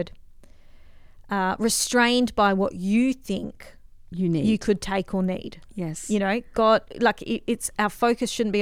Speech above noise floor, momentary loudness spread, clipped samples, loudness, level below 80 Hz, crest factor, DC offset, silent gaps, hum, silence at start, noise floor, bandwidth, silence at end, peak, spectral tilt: 23 dB; 11 LU; under 0.1%; -24 LUFS; -48 dBFS; 18 dB; under 0.1%; none; none; 0 s; -46 dBFS; 16.5 kHz; 0 s; -6 dBFS; -4.5 dB/octave